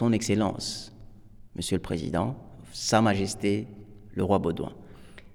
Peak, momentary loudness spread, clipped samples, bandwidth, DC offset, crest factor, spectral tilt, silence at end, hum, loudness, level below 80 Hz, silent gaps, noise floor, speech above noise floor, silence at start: -8 dBFS; 19 LU; under 0.1%; 17 kHz; under 0.1%; 20 dB; -5 dB/octave; 0 s; none; -28 LUFS; -50 dBFS; none; -48 dBFS; 21 dB; 0 s